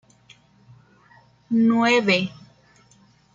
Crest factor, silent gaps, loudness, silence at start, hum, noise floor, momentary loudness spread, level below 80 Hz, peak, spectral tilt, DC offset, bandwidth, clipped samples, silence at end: 18 dB; none; -20 LUFS; 1.5 s; 60 Hz at -45 dBFS; -56 dBFS; 8 LU; -66 dBFS; -6 dBFS; -5 dB/octave; under 0.1%; 7.6 kHz; under 0.1%; 1.05 s